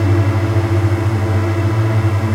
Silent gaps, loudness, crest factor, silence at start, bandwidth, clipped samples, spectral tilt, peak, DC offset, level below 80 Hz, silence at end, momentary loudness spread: none; -16 LUFS; 10 dB; 0 s; 11 kHz; under 0.1%; -8 dB/octave; -4 dBFS; under 0.1%; -40 dBFS; 0 s; 2 LU